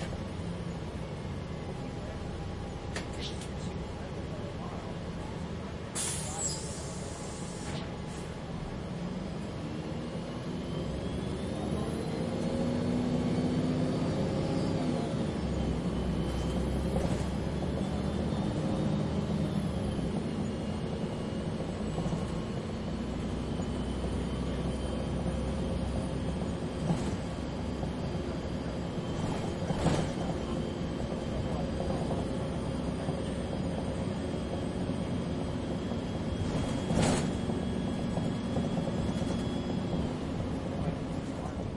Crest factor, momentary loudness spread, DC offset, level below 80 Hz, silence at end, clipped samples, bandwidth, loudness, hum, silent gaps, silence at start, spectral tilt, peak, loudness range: 18 dB; 8 LU; under 0.1%; -44 dBFS; 0 s; under 0.1%; 11.5 kHz; -34 LUFS; none; none; 0 s; -6 dB/octave; -14 dBFS; 6 LU